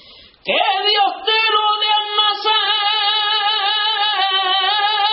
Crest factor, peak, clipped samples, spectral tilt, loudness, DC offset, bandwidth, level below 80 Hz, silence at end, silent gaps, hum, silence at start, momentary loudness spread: 14 dB; -4 dBFS; under 0.1%; 4.5 dB/octave; -15 LUFS; under 0.1%; 5.8 kHz; -66 dBFS; 0 s; none; none; 0.1 s; 1 LU